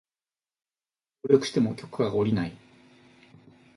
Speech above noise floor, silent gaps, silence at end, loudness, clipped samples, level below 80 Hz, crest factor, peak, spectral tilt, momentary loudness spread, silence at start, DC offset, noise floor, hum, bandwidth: over 65 dB; none; 1.2 s; -26 LUFS; under 0.1%; -62 dBFS; 24 dB; -6 dBFS; -6.5 dB/octave; 10 LU; 1.25 s; under 0.1%; under -90 dBFS; none; 11.5 kHz